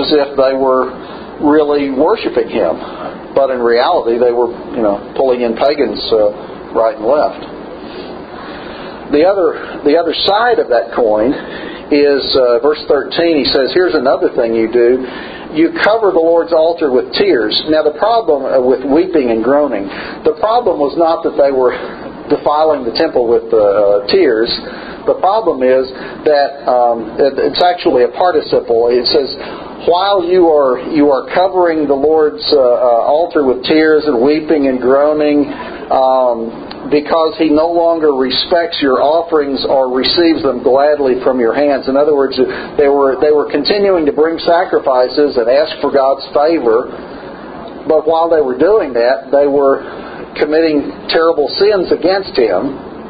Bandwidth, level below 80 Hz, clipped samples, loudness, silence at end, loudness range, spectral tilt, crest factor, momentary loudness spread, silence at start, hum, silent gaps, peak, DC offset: 5 kHz; -44 dBFS; under 0.1%; -12 LUFS; 0 s; 3 LU; -8 dB/octave; 12 dB; 10 LU; 0 s; none; none; 0 dBFS; under 0.1%